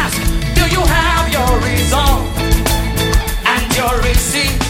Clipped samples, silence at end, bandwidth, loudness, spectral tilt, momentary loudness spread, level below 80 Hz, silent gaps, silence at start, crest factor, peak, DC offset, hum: under 0.1%; 0 s; 16.5 kHz; -14 LUFS; -4 dB/octave; 3 LU; -18 dBFS; none; 0 s; 14 dB; 0 dBFS; under 0.1%; none